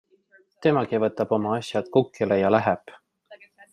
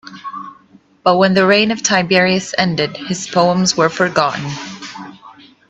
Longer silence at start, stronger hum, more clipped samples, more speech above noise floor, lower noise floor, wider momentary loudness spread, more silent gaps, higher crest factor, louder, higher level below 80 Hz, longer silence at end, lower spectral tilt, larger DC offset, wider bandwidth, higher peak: first, 0.6 s vs 0.05 s; neither; neither; about the same, 37 dB vs 34 dB; first, -60 dBFS vs -48 dBFS; second, 6 LU vs 18 LU; neither; about the same, 20 dB vs 16 dB; second, -24 LUFS vs -14 LUFS; second, -68 dBFS vs -56 dBFS; about the same, 0.35 s vs 0.4 s; first, -7 dB/octave vs -4 dB/octave; neither; first, 11 kHz vs 8.4 kHz; second, -4 dBFS vs 0 dBFS